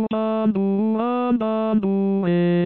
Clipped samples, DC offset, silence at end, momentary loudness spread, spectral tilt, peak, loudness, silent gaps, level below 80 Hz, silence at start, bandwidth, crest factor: under 0.1%; 0.2%; 0 s; 1 LU; -11.5 dB/octave; -10 dBFS; -21 LUFS; none; -62 dBFS; 0 s; 4.3 kHz; 10 dB